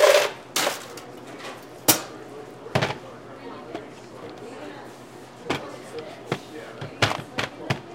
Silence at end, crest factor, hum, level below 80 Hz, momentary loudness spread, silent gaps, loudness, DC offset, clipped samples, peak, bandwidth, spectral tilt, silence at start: 0 s; 28 dB; none; -62 dBFS; 20 LU; none; -26 LUFS; under 0.1%; under 0.1%; 0 dBFS; 16.5 kHz; -3 dB/octave; 0 s